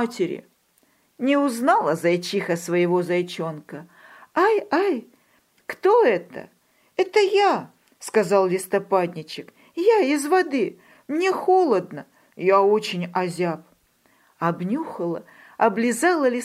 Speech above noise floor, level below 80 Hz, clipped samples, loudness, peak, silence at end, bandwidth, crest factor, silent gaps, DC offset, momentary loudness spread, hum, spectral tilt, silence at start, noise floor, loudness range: 42 dB; -76 dBFS; under 0.1%; -22 LUFS; -4 dBFS; 0 s; 15.5 kHz; 18 dB; none; under 0.1%; 18 LU; none; -5 dB/octave; 0 s; -63 dBFS; 3 LU